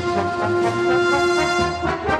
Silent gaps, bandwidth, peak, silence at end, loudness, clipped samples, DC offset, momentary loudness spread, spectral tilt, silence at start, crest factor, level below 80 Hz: none; 11 kHz; -6 dBFS; 0 s; -19 LUFS; under 0.1%; under 0.1%; 4 LU; -5 dB/octave; 0 s; 14 dB; -42 dBFS